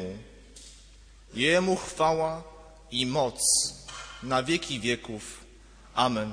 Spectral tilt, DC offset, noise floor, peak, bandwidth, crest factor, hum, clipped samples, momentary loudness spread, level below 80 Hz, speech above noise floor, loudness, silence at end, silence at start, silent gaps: -3 dB/octave; under 0.1%; -52 dBFS; -10 dBFS; 11 kHz; 20 dB; none; under 0.1%; 20 LU; -52 dBFS; 25 dB; -26 LUFS; 0 s; 0 s; none